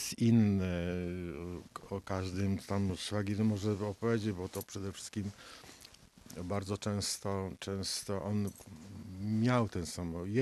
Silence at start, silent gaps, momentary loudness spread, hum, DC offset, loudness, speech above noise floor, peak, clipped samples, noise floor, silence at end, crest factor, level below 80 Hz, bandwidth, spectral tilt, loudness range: 0 s; none; 17 LU; none; under 0.1%; -35 LUFS; 23 dB; -16 dBFS; under 0.1%; -58 dBFS; 0 s; 20 dB; -64 dBFS; 13.5 kHz; -5.5 dB/octave; 4 LU